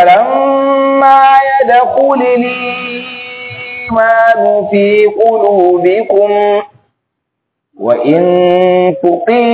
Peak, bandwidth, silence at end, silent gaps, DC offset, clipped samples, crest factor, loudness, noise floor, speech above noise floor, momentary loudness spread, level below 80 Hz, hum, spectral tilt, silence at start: 0 dBFS; 4 kHz; 0 s; none; under 0.1%; 0.8%; 10 dB; -9 LUFS; -72 dBFS; 64 dB; 12 LU; -52 dBFS; none; -9.5 dB/octave; 0 s